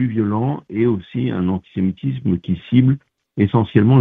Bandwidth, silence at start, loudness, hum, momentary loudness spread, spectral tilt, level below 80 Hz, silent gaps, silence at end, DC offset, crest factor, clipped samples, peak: 3.9 kHz; 0 s; -19 LUFS; none; 7 LU; -11.5 dB/octave; -48 dBFS; none; 0 s; under 0.1%; 16 dB; under 0.1%; 0 dBFS